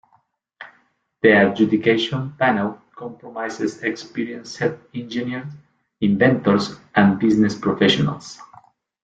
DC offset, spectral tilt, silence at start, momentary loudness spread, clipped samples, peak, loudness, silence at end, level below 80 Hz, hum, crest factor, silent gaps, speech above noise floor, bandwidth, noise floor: under 0.1%; -6 dB/octave; 0.6 s; 17 LU; under 0.1%; -2 dBFS; -19 LUFS; 0.6 s; -58 dBFS; none; 18 dB; none; 43 dB; 8 kHz; -62 dBFS